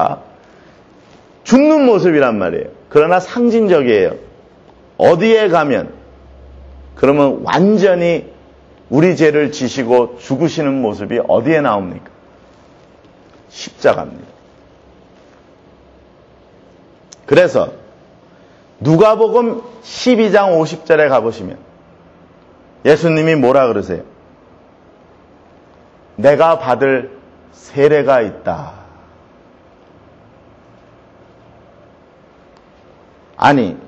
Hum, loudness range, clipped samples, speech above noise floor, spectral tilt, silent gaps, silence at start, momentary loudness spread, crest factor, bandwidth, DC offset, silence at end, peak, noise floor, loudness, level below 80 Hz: none; 9 LU; under 0.1%; 33 dB; -6.5 dB/octave; none; 0 s; 16 LU; 16 dB; 8.2 kHz; under 0.1%; 0.1 s; 0 dBFS; -45 dBFS; -13 LUFS; -50 dBFS